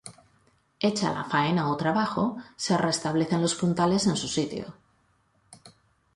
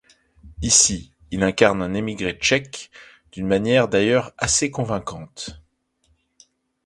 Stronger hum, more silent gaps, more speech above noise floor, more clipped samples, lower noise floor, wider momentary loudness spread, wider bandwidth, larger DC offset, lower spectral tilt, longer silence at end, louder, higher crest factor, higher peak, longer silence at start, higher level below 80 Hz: neither; neither; second, 41 dB vs 45 dB; neither; about the same, -67 dBFS vs -65 dBFS; second, 9 LU vs 19 LU; about the same, 11.5 kHz vs 11.5 kHz; neither; first, -5 dB/octave vs -3 dB/octave; second, 0.45 s vs 1.3 s; second, -26 LUFS vs -19 LUFS; about the same, 18 dB vs 22 dB; second, -10 dBFS vs 0 dBFS; second, 0.05 s vs 0.45 s; second, -60 dBFS vs -44 dBFS